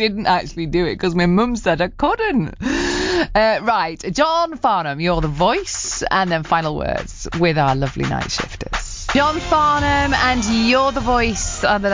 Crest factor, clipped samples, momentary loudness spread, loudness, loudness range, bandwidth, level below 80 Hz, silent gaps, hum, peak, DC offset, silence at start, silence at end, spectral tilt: 14 dB; under 0.1%; 7 LU; -18 LUFS; 3 LU; 7.8 kHz; -32 dBFS; none; none; -4 dBFS; under 0.1%; 0 s; 0 s; -4.5 dB/octave